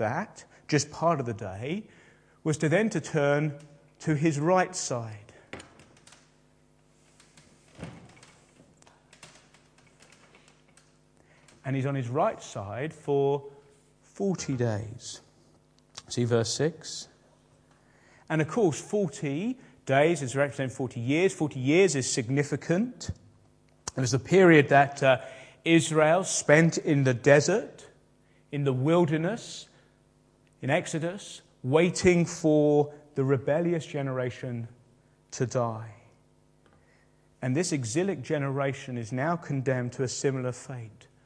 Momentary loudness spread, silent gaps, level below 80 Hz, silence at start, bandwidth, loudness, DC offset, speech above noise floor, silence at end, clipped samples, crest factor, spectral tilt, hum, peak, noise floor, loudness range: 19 LU; none; -64 dBFS; 0 s; 10.5 kHz; -27 LUFS; under 0.1%; 37 dB; 0.35 s; under 0.1%; 24 dB; -5.5 dB/octave; none; -4 dBFS; -63 dBFS; 10 LU